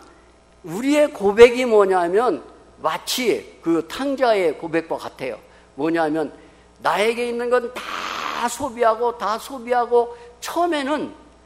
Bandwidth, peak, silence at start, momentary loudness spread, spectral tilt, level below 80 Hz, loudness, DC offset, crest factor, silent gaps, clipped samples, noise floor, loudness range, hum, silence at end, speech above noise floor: 16 kHz; 0 dBFS; 0.65 s; 12 LU; -4 dB/octave; -54 dBFS; -20 LUFS; under 0.1%; 20 dB; none; under 0.1%; -51 dBFS; 5 LU; none; 0.35 s; 32 dB